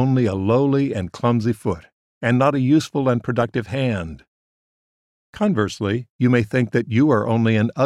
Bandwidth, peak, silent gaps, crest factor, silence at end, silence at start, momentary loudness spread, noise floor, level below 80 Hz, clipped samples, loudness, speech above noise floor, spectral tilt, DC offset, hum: 11.5 kHz; -4 dBFS; 1.93-2.21 s, 4.28-5.33 s, 6.10-6.19 s; 16 dB; 0 s; 0 s; 7 LU; under -90 dBFS; -52 dBFS; under 0.1%; -20 LUFS; over 71 dB; -7.5 dB/octave; under 0.1%; none